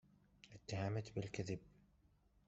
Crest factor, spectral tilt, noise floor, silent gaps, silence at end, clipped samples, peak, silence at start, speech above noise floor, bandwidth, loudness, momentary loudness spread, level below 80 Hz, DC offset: 20 dB; -6 dB/octave; -74 dBFS; none; 0.8 s; under 0.1%; -28 dBFS; 0.45 s; 30 dB; 8 kHz; -46 LUFS; 17 LU; -72 dBFS; under 0.1%